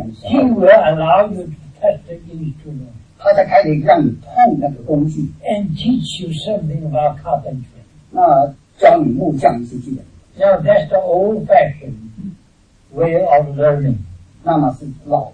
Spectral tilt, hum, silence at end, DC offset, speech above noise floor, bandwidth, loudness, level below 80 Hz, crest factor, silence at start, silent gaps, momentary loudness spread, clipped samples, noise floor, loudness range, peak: -7.5 dB/octave; none; 0.05 s; under 0.1%; 36 dB; 9.8 kHz; -14 LUFS; -44 dBFS; 14 dB; 0 s; none; 18 LU; under 0.1%; -50 dBFS; 3 LU; 0 dBFS